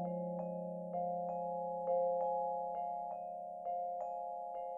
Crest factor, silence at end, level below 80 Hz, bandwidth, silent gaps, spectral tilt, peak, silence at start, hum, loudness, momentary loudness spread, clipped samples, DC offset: 14 dB; 0 s; -82 dBFS; 3 kHz; none; -11 dB/octave; -26 dBFS; 0 s; none; -40 LUFS; 8 LU; under 0.1%; under 0.1%